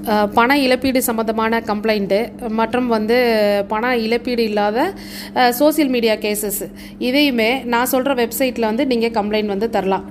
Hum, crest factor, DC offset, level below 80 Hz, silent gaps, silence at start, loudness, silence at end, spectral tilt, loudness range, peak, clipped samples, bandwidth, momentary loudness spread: 50 Hz at -35 dBFS; 16 dB; under 0.1%; -46 dBFS; none; 0 s; -17 LUFS; 0 s; -4 dB/octave; 1 LU; 0 dBFS; under 0.1%; 15.5 kHz; 6 LU